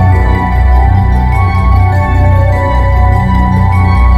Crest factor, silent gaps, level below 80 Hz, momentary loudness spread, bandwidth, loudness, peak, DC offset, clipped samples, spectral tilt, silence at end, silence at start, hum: 6 dB; none; -10 dBFS; 2 LU; 5.2 kHz; -9 LUFS; 0 dBFS; under 0.1%; under 0.1%; -8.5 dB/octave; 0 s; 0 s; none